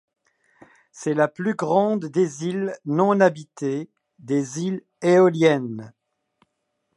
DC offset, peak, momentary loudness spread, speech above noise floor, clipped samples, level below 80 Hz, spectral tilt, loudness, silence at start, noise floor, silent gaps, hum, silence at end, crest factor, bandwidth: under 0.1%; -2 dBFS; 13 LU; 54 dB; under 0.1%; -74 dBFS; -6.5 dB/octave; -22 LUFS; 0.95 s; -75 dBFS; none; none; 1.05 s; 20 dB; 11.5 kHz